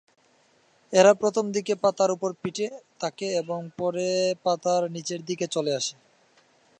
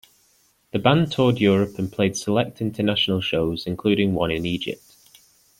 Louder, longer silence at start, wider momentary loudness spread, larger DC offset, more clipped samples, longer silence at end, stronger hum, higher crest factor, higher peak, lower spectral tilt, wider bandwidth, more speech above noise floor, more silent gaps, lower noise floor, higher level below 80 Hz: second, -25 LUFS vs -22 LUFS; first, 0.9 s vs 0.75 s; first, 13 LU vs 8 LU; neither; neither; about the same, 0.85 s vs 0.85 s; neither; about the same, 22 dB vs 20 dB; about the same, -4 dBFS vs -2 dBFS; second, -4 dB/octave vs -5.5 dB/octave; second, 9.8 kHz vs 16 kHz; about the same, 38 dB vs 40 dB; neither; about the same, -63 dBFS vs -62 dBFS; second, -76 dBFS vs -52 dBFS